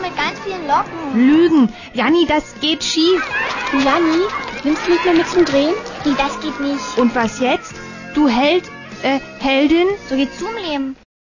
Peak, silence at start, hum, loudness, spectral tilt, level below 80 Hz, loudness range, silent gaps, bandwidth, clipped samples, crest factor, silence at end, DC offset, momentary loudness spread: -2 dBFS; 0 s; none; -16 LUFS; -4 dB/octave; -46 dBFS; 3 LU; none; 7.4 kHz; under 0.1%; 14 dB; 0.3 s; under 0.1%; 9 LU